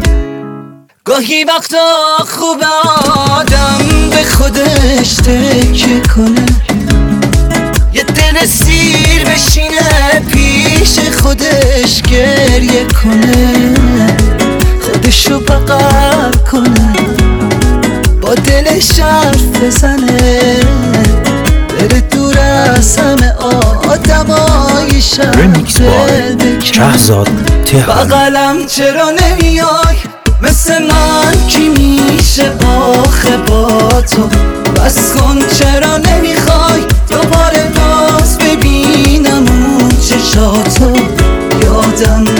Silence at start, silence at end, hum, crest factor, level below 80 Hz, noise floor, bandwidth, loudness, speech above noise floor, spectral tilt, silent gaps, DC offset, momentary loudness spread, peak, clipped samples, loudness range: 0 s; 0 s; none; 8 dB; -12 dBFS; -30 dBFS; over 20 kHz; -8 LUFS; 23 dB; -4.5 dB/octave; none; under 0.1%; 3 LU; 0 dBFS; 0.6%; 1 LU